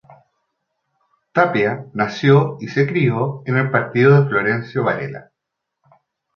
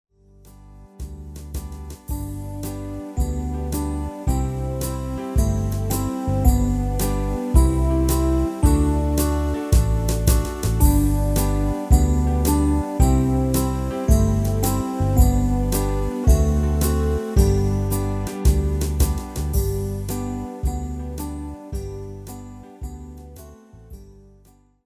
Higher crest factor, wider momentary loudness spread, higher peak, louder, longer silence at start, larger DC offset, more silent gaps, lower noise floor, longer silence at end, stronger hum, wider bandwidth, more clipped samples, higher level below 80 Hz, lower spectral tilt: about the same, 18 dB vs 20 dB; second, 9 LU vs 15 LU; about the same, -2 dBFS vs -2 dBFS; first, -17 LUFS vs -22 LUFS; first, 1.35 s vs 0.45 s; neither; neither; first, -80 dBFS vs -54 dBFS; first, 1.15 s vs 0.75 s; neither; second, 6.6 kHz vs 16 kHz; neither; second, -58 dBFS vs -22 dBFS; first, -8 dB/octave vs -6.5 dB/octave